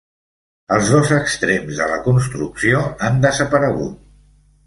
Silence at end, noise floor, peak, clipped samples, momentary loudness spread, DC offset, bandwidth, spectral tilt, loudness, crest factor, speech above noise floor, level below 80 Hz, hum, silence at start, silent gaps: 0.7 s; -51 dBFS; -2 dBFS; under 0.1%; 6 LU; under 0.1%; 11.5 kHz; -5.5 dB/octave; -17 LUFS; 16 dB; 35 dB; -44 dBFS; 50 Hz at -40 dBFS; 0.7 s; none